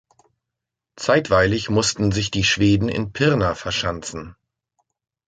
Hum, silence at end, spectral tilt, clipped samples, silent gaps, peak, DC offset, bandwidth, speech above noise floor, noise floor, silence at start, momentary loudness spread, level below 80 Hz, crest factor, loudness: none; 0.95 s; -4.5 dB/octave; under 0.1%; none; -4 dBFS; under 0.1%; 9.4 kHz; 64 dB; -84 dBFS; 1 s; 10 LU; -40 dBFS; 18 dB; -20 LUFS